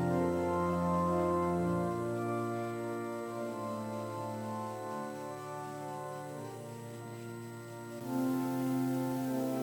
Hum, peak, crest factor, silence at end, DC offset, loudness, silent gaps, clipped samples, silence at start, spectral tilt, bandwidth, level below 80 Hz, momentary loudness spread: none; -20 dBFS; 14 dB; 0 s; under 0.1%; -36 LUFS; none; under 0.1%; 0 s; -7 dB/octave; 19 kHz; -62 dBFS; 13 LU